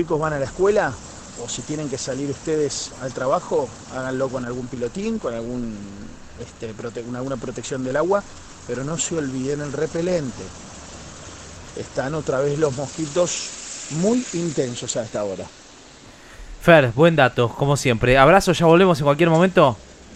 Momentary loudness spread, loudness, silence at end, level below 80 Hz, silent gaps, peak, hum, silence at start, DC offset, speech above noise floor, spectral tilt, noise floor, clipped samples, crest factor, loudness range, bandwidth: 21 LU; -21 LUFS; 0 s; -44 dBFS; none; 0 dBFS; none; 0 s; under 0.1%; 24 dB; -5 dB/octave; -44 dBFS; under 0.1%; 22 dB; 11 LU; 14 kHz